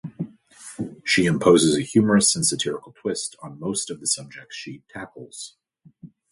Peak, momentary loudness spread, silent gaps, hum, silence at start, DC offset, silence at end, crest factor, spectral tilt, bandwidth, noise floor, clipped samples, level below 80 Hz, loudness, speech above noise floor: -4 dBFS; 21 LU; none; none; 0.05 s; under 0.1%; 0.25 s; 20 dB; -3.5 dB/octave; 11.5 kHz; -48 dBFS; under 0.1%; -58 dBFS; -21 LUFS; 25 dB